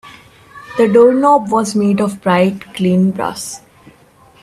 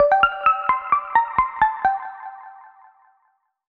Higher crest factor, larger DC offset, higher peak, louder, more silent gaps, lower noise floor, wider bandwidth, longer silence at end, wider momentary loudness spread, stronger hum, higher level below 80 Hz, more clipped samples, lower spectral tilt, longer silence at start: about the same, 14 dB vs 18 dB; neither; first, 0 dBFS vs -4 dBFS; first, -13 LUFS vs -20 LUFS; neither; second, -46 dBFS vs -67 dBFS; first, 14 kHz vs 5 kHz; second, 0.85 s vs 1 s; second, 15 LU vs 19 LU; neither; about the same, -54 dBFS vs -50 dBFS; neither; about the same, -6 dB/octave vs -5 dB/octave; about the same, 0.05 s vs 0 s